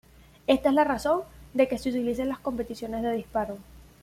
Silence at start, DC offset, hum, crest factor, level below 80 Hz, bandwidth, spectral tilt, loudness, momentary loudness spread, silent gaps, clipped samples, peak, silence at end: 0.5 s; under 0.1%; none; 20 dB; -52 dBFS; 15.5 kHz; -5.5 dB/octave; -27 LUFS; 10 LU; none; under 0.1%; -8 dBFS; 0.2 s